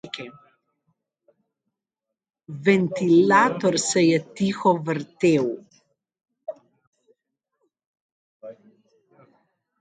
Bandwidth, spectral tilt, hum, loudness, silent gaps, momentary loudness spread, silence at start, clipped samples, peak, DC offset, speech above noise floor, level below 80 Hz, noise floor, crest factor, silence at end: 9.6 kHz; -5 dB/octave; none; -20 LUFS; 6.87-6.93 s, 7.86-7.94 s, 8.01-8.40 s; 23 LU; 0.05 s; under 0.1%; -4 dBFS; under 0.1%; 66 dB; -70 dBFS; -86 dBFS; 22 dB; 1.3 s